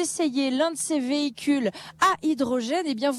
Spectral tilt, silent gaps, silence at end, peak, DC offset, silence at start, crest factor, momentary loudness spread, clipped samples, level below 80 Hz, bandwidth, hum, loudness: -3 dB/octave; none; 0 s; -8 dBFS; under 0.1%; 0 s; 16 dB; 4 LU; under 0.1%; -68 dBFS; 14.5 kHz; none; -25 LUFS